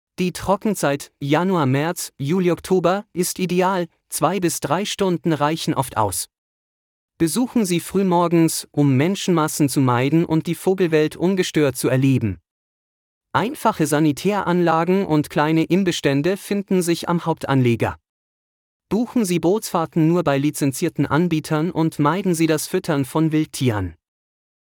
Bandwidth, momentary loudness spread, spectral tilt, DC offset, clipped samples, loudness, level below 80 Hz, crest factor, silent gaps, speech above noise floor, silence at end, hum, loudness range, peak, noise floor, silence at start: 19 kHz; 5 LU; -5.5 dB/octave; under 0.1%; under 0.1%; -20 LUFS; -56 dBFS; 16 dB; 6.38-7.08 s, 12.51-13.21 s, 18.09-18.80 s; over 71 dB; 0.85 s; none; 3 LU; -4 dBFS; under -90 dBFS; 0.2 s